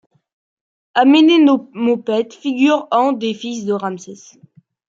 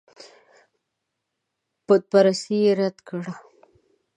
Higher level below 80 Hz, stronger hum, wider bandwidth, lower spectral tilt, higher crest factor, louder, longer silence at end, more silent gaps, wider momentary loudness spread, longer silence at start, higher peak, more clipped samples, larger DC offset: first, -70 dBFS vs -78 dBFS; neither; second, 7.6 kHz vs 10 kHz; about the same, -5 dB/octave vs -6 dB/octave; second, 14 dB vs 20 dB; first, -15 LUFS vs -21 LUFS; about the same, 0.8 s vs 0.75 s; neither; second, 13 LU vs 16 LU; second, 0.95 s vs 1.9 s; about the same, -2 dBFS vs -4 dBFS; neither; neither